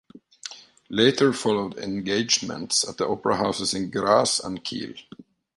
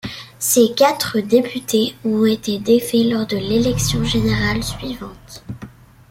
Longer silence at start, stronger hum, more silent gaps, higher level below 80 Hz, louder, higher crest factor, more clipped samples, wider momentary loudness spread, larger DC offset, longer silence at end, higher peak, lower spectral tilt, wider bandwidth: about the same, 0.15 s vs 0.05 s; neither; neither; second, -60 dBFS vs -38 dBFS; second, -23 LUFS vs -17 LUFS; first, 22 dB vs 16 dB; neither; about the same, 18 LU vs 18 LU; neither; about the same, 0.35 s vs 0.4 s; about the same, -4 dBFS vs -2 dBFS; second, -3 dB/octave vs -4.5 dB/octave; second, 11.5 kHz vs 16.5 kHz